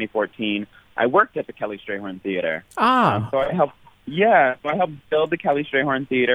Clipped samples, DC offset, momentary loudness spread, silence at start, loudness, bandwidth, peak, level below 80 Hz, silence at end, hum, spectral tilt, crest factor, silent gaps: under 0.1%; under 0.1%; 13 LU; 0 s; -21 LUFS; 12.5 kHz; -2 dBFS; -58 dBFS; 0 s; none; -7 dB/octave; 18 dB; none